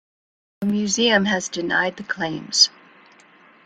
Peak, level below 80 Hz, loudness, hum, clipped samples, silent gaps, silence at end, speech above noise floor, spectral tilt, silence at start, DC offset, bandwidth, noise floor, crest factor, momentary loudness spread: -2 dBFS; -62 dBFS; -20 LUFS; none; under 0.1%; none; 0.95 s; 31 dB; -2.5 dB/octave; 0.6 s; under 0.1%; 9.6 kHz; -51 dBFS; 22 dB; 10 LU